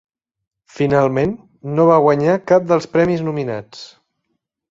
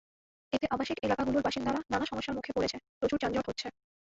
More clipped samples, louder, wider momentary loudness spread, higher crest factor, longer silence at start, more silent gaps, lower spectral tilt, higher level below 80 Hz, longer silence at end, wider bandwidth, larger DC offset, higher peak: neither; first, -16 LUFS vs -33 LUFS; first, 15 LU vs 7 LU; about the same, 16 dB vs 18 dB; first, 0.75 s vs 0.5 s; second, none vs 2.89-3.01 s; first, -7.5 dB/octave vs -5 dB/octave; about the same, -52 dBFS vs -56 dBFS; first, 0.85 s vs 0.45 s; about the same, 7.8 kHz vs 7.8 kHz; neither; first, -2 dBFS vs -16 dBFS